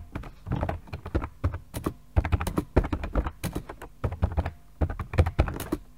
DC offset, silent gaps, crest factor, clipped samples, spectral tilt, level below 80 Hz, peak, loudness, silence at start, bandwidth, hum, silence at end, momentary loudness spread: 0.3%; none; 24 dB; under 0.1%; -7 dB/octave; -32 dBFS; -6 dBFS; -31 LUFS; 0 s; 16 kHz; none; 0.05 s; 10 LU